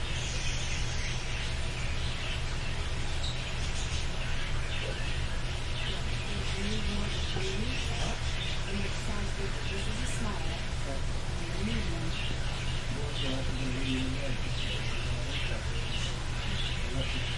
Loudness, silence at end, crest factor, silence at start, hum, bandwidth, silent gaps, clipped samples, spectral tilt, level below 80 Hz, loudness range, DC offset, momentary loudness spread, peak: -34 LUFS; 0 s; 14 dB; 0 s; none; 11.5 kHz; none; under 0.1%; -4 dB/octave; -34 dBFS; 1 LU; under 0.1%; 2 LU; -18 dBFS